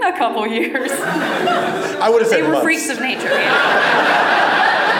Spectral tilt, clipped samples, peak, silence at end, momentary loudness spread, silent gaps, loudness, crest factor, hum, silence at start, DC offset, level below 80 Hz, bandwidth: -3 dB/octave; under 0.1%; -2 dBFS; 0 s; 6 LU; none; -15 LUFS; 12 dB; none; 0 s; under 0.1%; -64 dBFS; over 20 kHz